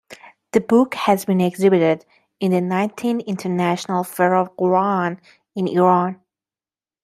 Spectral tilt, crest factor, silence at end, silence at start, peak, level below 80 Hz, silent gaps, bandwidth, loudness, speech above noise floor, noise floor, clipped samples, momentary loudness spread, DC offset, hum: -6.5 dB/octave; 18 dB; 0.9 s; 0.1 s; -2 dBFS; -64 dBFS; none; 15 kHz; -19 LUFS; over 72 dB; under -90 dBFS; under 0.1%; 9 LU; under 0.1%; none